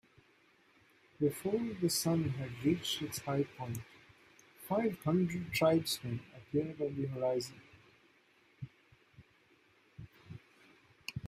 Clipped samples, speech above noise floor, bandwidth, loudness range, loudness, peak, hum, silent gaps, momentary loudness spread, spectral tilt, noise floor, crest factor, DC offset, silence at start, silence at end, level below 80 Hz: under 0.1%; 34 dB; 15.5 kHz; 9 LU; -35 LUFS; -18 dBFS; none; none; 22 LU; -5 dB/octave; -68 dBFS; 20 dB; under 0.1%; 1.2 s; 0 s; -68 dBFS